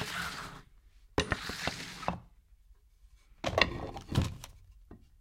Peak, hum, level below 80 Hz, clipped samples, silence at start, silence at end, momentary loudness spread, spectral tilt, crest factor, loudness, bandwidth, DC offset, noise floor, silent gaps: -6 dBFS; none; -50 dBFS; under 0.1%; 0 s; 0.2 s; 18 LU; -4 dB/octave; 32 dB; -35 LUFS; 16 kHz; under 0.1%; -61 dBFS; none